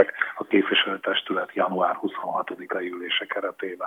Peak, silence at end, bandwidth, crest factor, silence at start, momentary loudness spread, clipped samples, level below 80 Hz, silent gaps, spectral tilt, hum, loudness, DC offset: -4 dBFS; 0 s; 14.5 kHz; 22 dB; 0 s; 9 LU; under 0.1%; -88 dBFS; none; -5.5 dB/octave; none; -25 LUFS; under 0.1%